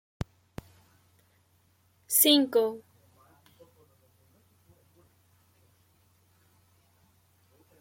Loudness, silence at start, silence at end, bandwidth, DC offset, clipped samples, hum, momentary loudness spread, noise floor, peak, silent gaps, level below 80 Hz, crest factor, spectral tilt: -24 LUFS; 0.2 s; 5 s; 16.5 kHz; under 0.1%; under 0.1%; none; 28 LU; -67 dBFS; -8 dBFS; none; -62 dBFS; 26 dB; -2.5 dB/octave